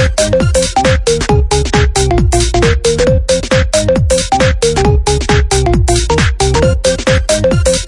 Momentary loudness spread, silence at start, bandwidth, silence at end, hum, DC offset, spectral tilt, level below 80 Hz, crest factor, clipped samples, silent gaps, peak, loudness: 1 LU; 0 s; 11.5 kHz; 0 s; none; under 0.1%; -4.5 dB/octave; -16 dBFS; 10 dB; under 0.1%; none; 0 dBFS; -11 LUFS